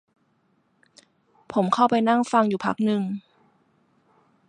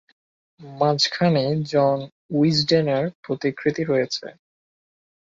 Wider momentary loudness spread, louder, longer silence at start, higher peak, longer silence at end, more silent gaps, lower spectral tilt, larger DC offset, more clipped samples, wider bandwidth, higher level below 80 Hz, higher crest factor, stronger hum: about the same, 9 LU vs 9 LU; about the same, -22 LUFS vs -21 LUFS; first, 1.5 s vs 0.6 s; about the same, -4 dBFS vs -6 dBFS; first, 1.3 s vs 1.05 s; second, none vs 2.12-2.29 s, 3.15-3.23 s; about the same, -6.5 dB/octave vs -5.5 dB/octave; neither; neither; first, 10 kHz vs 7.8 kHz; second, -70 dBFS vs -62 dBFS; about the same, 20 dB vs 18 dB; neither